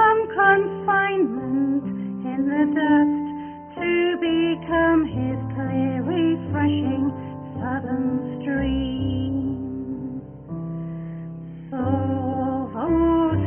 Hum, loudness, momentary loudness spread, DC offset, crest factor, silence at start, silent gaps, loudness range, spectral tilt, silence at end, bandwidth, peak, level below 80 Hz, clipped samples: none; -23 LUFS; 15 LU; under 0.1%; 16 dB; 0 s; none; 7 LU; -11.5 dB/octave; 0 s; 3.4 kHz; -6 dBFS; -44 dBFS; under 0.1%